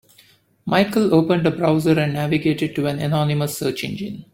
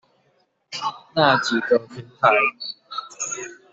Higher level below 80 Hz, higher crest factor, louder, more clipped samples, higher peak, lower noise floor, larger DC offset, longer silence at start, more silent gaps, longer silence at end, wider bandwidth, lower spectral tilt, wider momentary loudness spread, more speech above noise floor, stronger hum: first, -52 dBFS vs -66 dBFS; about the same, 18 dB vs 20 dB; about the same, -20 LUFS vs -21 LUFS; neither; about the same, -2 dBFS vs -2 dBFS; second, -54 dBFS vs -65 dBFS; neither; about the same, 0.65 s vs 0.7 s; neither; about the same, 0.1 s vs 0.2 s; first, 16.5 kHz vs 8 kHz; first, -6.5 dB/octave vs -3 dB/octave; second, 9 LU vs 16 LU; second, 35 dB vs 46 dB; neither